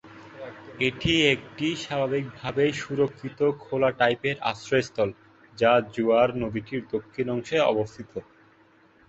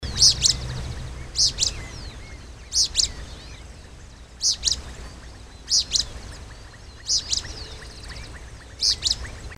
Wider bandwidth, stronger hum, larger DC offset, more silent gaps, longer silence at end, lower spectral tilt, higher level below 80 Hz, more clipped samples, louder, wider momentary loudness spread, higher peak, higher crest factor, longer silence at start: second, 8 kHz vs 16.5 kHz; neither; neither; neither; first, 0.85 s vs 0 s; first, -5.5 dB/octave vs -0.5 dB/octave; second, -54 dBFS vs -38 dBFS; neither; second, -25 LUFS vs -21 LUFS; second, 13 LU vs 23 LU; about the same, -4 dBFS vs -4 dBFS; about the same, 22 dB vs 24 dB; about the same, 0.05 s vs 0 s